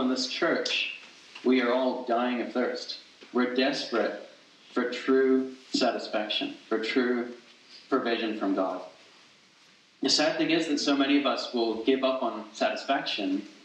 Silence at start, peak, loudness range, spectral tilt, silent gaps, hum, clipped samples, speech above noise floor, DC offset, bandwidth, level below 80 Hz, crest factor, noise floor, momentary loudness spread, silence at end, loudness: 0 s; -10 dBFS; 3 LU; -3 dB/octave; none; none; under 0.1%; 32 dB; under 0.1%; 9.4 kHz; -84 dBFS; 18 dB; -59 dBFS; 9 LU; 0.1 s; -28 LUFS